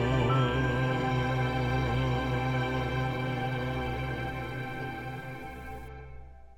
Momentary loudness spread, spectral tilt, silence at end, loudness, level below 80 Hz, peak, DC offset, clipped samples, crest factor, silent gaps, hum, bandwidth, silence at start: 16 LU; -7 dB/octave; 0 s; -31 LUFS; -42 dBFS; -14 dBFS; under 0.1%; under 0.1%; 16 dB; none; none; 9 kHz; 0 s